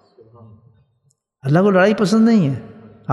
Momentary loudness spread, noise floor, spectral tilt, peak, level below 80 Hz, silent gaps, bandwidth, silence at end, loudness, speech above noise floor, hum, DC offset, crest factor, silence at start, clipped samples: 16 LU; -64 dBFS; -7 dB/octave; -2 dBFS; -62 dBFS; none; 11.5 kHz; 0 s; -15 LUFS; 49 dB; none; under 0.1%; 16 dB; 1.45 s; under 0.1%